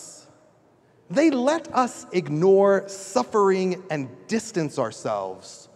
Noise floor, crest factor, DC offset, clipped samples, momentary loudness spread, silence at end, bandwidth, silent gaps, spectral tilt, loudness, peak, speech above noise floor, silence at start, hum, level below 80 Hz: -58 dBFS; 18 dB; under 0.1%; under 0.1%; 12 LU; 0.2 s; 12 kHz; none; -5.5 dB/octave; -23 LUFS; -6 dBFS; 35 dB; 0 s; none; -72 dBFS